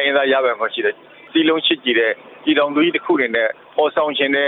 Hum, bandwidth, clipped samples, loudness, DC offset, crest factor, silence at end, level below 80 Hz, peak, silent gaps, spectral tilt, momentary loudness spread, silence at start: none; 4.2 kHz; under 0.1%; -17 LUFS; under 0.1%; 14 dB; 0 s; -66 dBFS; -4 dBFS; none; -7 dB/octave; 6 LU; 0 s